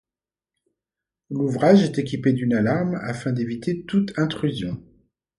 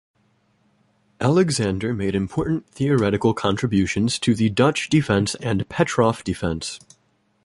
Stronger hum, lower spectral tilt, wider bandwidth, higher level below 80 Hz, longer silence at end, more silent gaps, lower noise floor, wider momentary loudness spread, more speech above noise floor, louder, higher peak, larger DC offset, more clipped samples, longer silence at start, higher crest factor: neither; first, -7.5 dB/octave vs -5.5 dB/octave; about the same, 11 kHz vs 11.5 kHz; second, -56 dBFS vs -44 dBFS; about the same, 0.55 s vs 0.65 s; neither; first, under -90 dBFS vs -65 dBFS; first, 12 LU vs 7 LU; first, over 69 dB vs 44 dB; about the same, -22 LUFS vs -21 LUFS; about the same, -4 dBFS vs -2 dBFS; neither; neither; about the same, 1.3 s vs 1.2 s; about the same, 20 dB vs 18 dB